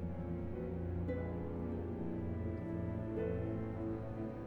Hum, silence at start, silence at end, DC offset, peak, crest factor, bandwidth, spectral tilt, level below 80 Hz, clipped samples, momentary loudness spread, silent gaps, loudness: none; 0 s; 0 s; under 0.1%; -28 dBFS; 12 dB; 4.2 kHz; -11 dB/octave; -54 dBFS; under 0.1%; 3 LU; none; -41 LUFS